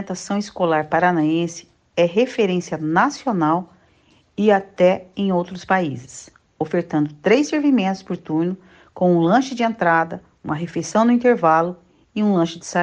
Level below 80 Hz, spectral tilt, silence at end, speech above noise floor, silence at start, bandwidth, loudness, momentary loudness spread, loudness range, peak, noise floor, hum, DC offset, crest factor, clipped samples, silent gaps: -60 dBFS; -6 dB/octave; 0 s; 38 dB; 0 s; 9.6 kHz; -19 LUFS; 12 LU; 2 LU; -4 dBFS; -57 dBFS; none; under 0.1%; 16 dB; under 0.1%; none